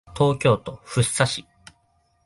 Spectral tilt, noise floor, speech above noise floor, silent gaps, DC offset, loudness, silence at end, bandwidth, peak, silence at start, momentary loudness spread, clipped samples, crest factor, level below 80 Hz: -4.5 dB/octave; -65 dBFS; 44 dB; none; under 0.1%; -22 LUFS; 0.85 s; 11.5 kHz; -4 dBFS; 0.1 s; 8 LU; under 0.1%; 20 dB; -50 dBFS